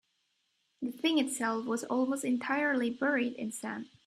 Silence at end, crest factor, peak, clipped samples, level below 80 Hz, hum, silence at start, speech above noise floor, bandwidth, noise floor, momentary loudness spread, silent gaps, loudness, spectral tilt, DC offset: 0.2 s; 16 dB; -16 dBFS; under 0.1%; -80 dBFS; none; 0.8 s; 46 dB; 15 kHz; -77 dBFS; 10 LU; none; -32 LUFS; -3 dB/octave; under 0.1%